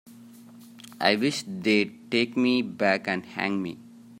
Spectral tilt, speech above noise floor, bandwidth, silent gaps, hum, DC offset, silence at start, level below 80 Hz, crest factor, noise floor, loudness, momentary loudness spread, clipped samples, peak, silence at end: -4.5 dB/octave; 23 dB; 16 kHz; none; none; under 0.1%; 0.05 s; -72 dBFS; 22 dB; -48 dBFS; -26 LUFS; 12 LU; under 0.1%; -4 dBFS; 0 s